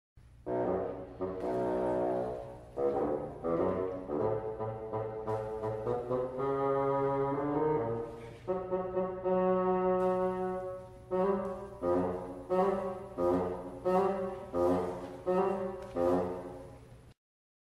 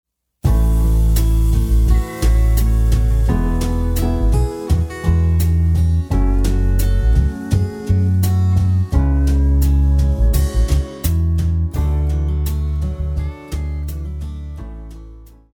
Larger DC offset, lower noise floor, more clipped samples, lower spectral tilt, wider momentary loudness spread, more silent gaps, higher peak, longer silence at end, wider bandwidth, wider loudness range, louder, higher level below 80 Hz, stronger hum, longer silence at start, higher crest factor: neither; first, -53 dBFS vs -38 dBFS; neither; first, -8.5 dB/octave vs -7 dB/octave; about the same, 9 LU vs 9 LU; neither; second, -18 dBFS vs -2 dBFS; first, 0.5 s vs 0.3 s; second, 12 kHz vs 18.5 kHz; about the same, 3 LU vs 5 LU; second, -33 LUFS vs -18 LUFS; second, -58 dBFS vs -16 dBFS; neither; second, 0.15 s vs 0.45 s; about the same, 16 dB vs 12 dB